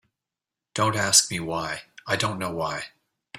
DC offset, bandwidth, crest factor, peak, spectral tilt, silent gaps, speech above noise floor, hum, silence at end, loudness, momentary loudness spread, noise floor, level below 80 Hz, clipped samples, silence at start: under 0.1%; 16 kHz; 26 dB; -2 dBFS; -2 dB/octave; none; 64 dB; none; 0 s; -23 LUFS; 17 LU; -88 dBFS; -60 dBFS; under 0.1%; 0.75 s